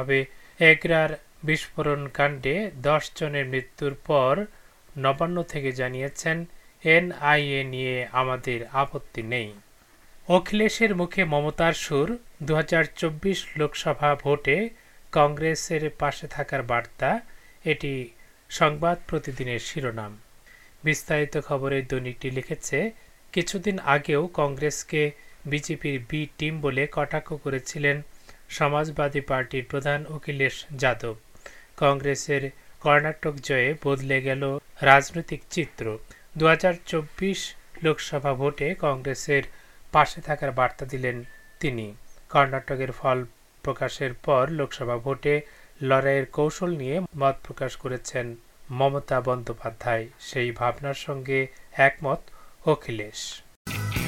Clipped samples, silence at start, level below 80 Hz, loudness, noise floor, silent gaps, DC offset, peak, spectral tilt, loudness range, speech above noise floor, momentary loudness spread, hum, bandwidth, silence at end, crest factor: under 0.1%; 0 s; -48 dBFS; -25 LUFS; -54 dBFS; 53.56-53.65 s; under 0.1%; 0 dBFS; -5 dB/octave; 5 LU; 29 dB; 11 LU; none; 16.5 kHz; 0 s; 26 dB